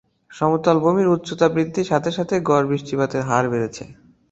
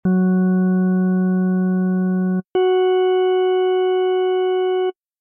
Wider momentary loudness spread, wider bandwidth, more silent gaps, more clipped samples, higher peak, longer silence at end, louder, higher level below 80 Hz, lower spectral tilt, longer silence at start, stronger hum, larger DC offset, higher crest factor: first, 6 LU vs 3 LU; first, 8.2 kHz vs 3.1 kHz; neither; neither; first, -2 dBFS vs -10 dBFS; about the same, 0.4 s vs 0.3 s; about the same, -20 LUFS vs -18 LUFS; first, -56 dBFS vs -62 dBFS; second, -6.5 dB/octave vs -11 dB/octave; first, 0.3 s vs 0.05 s; neither; neither; first, 18 dB vs 6 dB